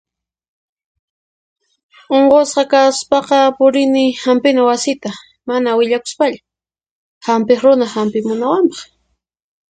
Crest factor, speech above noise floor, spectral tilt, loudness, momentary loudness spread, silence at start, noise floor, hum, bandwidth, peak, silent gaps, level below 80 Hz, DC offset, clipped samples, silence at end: 14 dB; 55 dB; -4 dB/octave; -14 LUFS; 9 LU; 2.1 s; -68 dBFS; none; 9.4 kHz; 0 dBFS; 6.91-7.21 s; -60 dBFS; under 0.1%; under 0.1%; 0.9 s